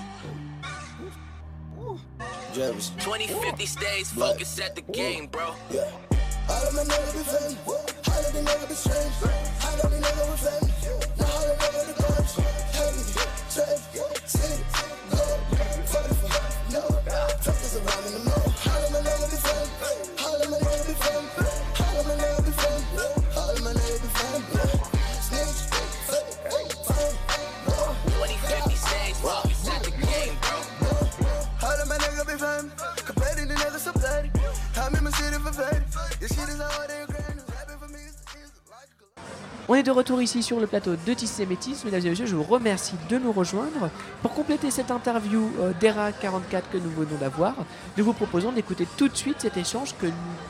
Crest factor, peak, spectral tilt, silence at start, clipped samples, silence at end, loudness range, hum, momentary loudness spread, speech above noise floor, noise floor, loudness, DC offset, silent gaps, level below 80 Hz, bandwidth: 18 dB; -8 dBFS; -4.5 dB/octave; 0 s; under 0.1%; 0 s; 3 LU; none; 8 LU; 27 dB; -53 dBFS; -27 LUFS; under 0.1%; none; -32 dBFS; 16 kHz